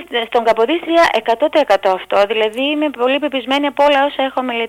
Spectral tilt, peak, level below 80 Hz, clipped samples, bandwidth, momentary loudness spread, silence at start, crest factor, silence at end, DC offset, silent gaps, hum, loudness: -3.5 dB/octave; -4 dBFS; -54 dBFS; under 0.1%; 16 kHz; 4 LU; 0 s; 12 dB; 0 s; under 0.1%; none; none; -15 LUFS